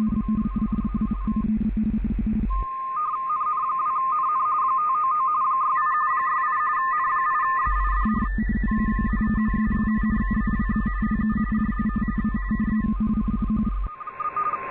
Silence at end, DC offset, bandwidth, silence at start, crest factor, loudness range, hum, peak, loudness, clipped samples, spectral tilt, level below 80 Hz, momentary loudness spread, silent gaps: 0 s; under 0.1%; 4 kHz; 0 s; 10 dB; 4 LU; none; -14 dBFS; -24 LUFS; under 0.1%; -11.5 dB/octave; -30 dBFS; 5 LU; none